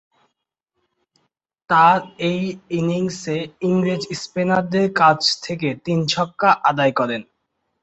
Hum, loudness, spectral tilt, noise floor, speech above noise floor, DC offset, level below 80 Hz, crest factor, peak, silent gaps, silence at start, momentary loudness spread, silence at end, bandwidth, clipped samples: none; -19 LUFS; -5 dB/octave; -78 dBFS; 59 dB; under 0.1%; -60 dBFS; 18 dB; -2 dBFS; none; 1.7 s; 10 LU; 0.6 s; 8.2 kHz; under 0.1%